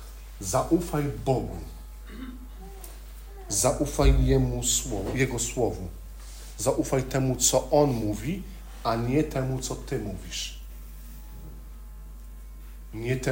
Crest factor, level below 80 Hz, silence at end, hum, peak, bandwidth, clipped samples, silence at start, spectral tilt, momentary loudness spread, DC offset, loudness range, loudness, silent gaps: 20 dB; -36 dBFS; 0 s; none; -8 dBFS; 16.5 kHz; under 0.1%; 0 s; -4.5 dB/octave; 22 LU; under 0.1%; 9 LU; -27 LUFS; none